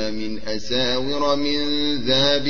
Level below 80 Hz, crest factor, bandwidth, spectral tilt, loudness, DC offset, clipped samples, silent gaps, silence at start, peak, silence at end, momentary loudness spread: -46 dBFS; 16 dB; 7.2 kHz; -4 dB/octave; -21 LUFS; 6%; under 0.1%; none; 0 s; -6 dBFS; 0 s; 10 LU